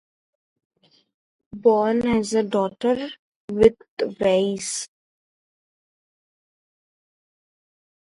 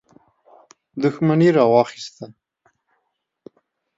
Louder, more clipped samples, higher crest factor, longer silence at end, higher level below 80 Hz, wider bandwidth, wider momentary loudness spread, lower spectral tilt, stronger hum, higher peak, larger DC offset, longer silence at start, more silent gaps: second, -22 LUFS vs -17 LUFS; neither; about the same, 22 dB vs 20 dB; first, 3.25 s vs 1.7 s; first, -54 dBFS vs -68 dBFS; first, 11.5 kHz vs 7.8 kHz; second, 15 LU vs 24 LU; second, -4.5 dB/octave vs -7.5 dB/octave; neither; about the same, -2 dBFS vs -2 dBFS; neither; first, 1.55 s vs 0.95 s; first, 3.19-3.48 s, 3.88-3.97 s vs none